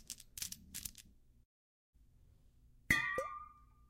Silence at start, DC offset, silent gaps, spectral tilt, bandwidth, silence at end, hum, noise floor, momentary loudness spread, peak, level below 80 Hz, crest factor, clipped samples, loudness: 0 s; under 0.1%; 1.45-1.93 s; -2.5 dB/octave; 16.5 kHz; 0.3 s; none; -66 dBFS; 19 LU; -16 dBFS; -62 dBFS; 30 dB; under 0.1%; -39 LUFS